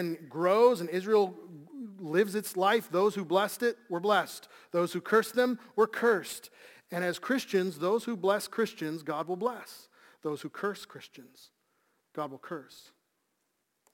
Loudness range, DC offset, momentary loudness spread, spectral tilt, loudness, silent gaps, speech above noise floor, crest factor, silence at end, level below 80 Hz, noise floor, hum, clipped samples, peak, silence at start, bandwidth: 12 LU; under 0.1%; 17 LU; -4.5 dB/octave; -30 LUFS; none; 49 dB; 20 dB; 1.15 s; -84 dBFS; -79 dBFS; none; under 0.1%; -12 dBFS; 0 s; 17 kHz